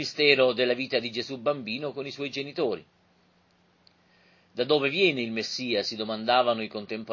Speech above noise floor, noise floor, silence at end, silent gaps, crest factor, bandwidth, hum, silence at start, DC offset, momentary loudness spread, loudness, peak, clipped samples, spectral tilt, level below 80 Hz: 38 dB; -65 dBFS; 0 s; none; 24 dB; 7.4 kHz; none; 0 s; under 0.1%; 12 LU; -26 LUFS; -4 dBFS; under 0.1%; -4 dB/octave; -72 dBFS